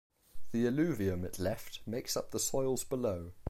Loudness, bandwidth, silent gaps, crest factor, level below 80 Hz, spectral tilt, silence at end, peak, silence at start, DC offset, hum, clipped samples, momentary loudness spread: -35 LUFS; 16.5 kHz; none; 14 dB; -56 dBFS; -5 dB/octave; 0 s; -20 dBFS; 0.1 s; under 0.1%; none; under 0.1%; 8 LU